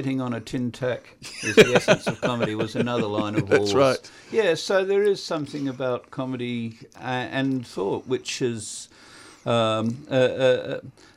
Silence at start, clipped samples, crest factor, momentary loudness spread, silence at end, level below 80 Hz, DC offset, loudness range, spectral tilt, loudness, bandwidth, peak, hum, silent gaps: 0 s; under 0.1%; 20 dB; 12 LU; 0.25 s; -58 dBFS; under 0.1%; 7 LU; -5 dB/octave; -24 LUFS; 15 kHz; -4 dBFS; none; none